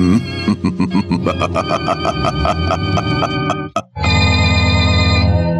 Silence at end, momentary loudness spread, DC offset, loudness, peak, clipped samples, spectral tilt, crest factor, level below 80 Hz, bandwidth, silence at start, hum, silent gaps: 0 s; 6 LU; under 0.1%; -15 LUFS; -2 dBFS; under 0.1%; -6 dB/octave; 12 dB; -30 dBFS; 10.5 kHz; 0 s; none; none